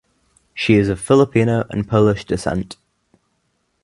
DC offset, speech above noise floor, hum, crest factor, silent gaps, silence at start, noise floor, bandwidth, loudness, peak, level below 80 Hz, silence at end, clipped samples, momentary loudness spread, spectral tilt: under 0.1%; 51 dB; none; 18 dB; none; 0.55 s; -68 dBFS; 11.5 kHz; -17 LUFS; 0 dBFS; -42 dBFS; 1.1 s; under 0.1%; 11 LU; -6.5 dB/octave